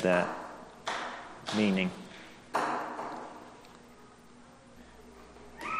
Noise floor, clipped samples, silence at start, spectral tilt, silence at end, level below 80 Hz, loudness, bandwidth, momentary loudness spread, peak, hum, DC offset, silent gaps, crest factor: -55 dBFS; under 0.1%; 0 s; -5.5 dB/octave; 0 s; -66 dBFS; -34 LUFS; 13 kHz; 26 LU; -12 dBFS; 60 Hz at -60 dBFS; under 0.1%; none; 22 dB